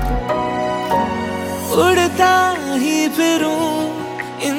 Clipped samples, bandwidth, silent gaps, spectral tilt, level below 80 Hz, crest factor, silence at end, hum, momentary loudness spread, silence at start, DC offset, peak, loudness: under 0.1%; 17 kHz; none; -4 dB/octave; -34 dBFS; 16 dB; 0 s; none; 9 LU; 0 s; under 0.1%; 0 dBFS; -17 LUFS